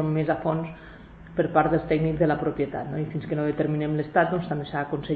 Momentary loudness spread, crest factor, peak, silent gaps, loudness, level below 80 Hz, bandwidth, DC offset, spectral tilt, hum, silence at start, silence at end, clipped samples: 8 LU; 20 dB; -6 dBFS; none; -26 LUFS; -48 dBFS; 4.7 kHz; under 0.1%; -10.5 dB/octave; none; 0 s; 0 s; under 0.1%